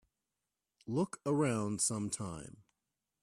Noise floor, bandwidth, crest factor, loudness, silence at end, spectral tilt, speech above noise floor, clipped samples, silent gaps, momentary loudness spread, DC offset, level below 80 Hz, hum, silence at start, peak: -90 dBFS; 15 kHz; 18 dB; -35 LUFS; 0.7 s; -5 dB/octave; 54 dB; under 0.1%; none; 17 LU; under 0.1%; -70 dBFS; none; 0.85 s; -20 dBFS